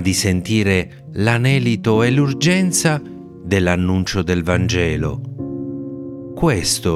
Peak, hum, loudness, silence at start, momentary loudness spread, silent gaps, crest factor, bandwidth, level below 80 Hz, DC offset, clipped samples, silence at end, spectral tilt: 0 dBFS; none; -18 LUFS; 0 s; 13 LU; none; 18 dB; 15.5 kHz; -42 dBFS; under 0.1%; under 0.1%; 0 s; -5 dB/octave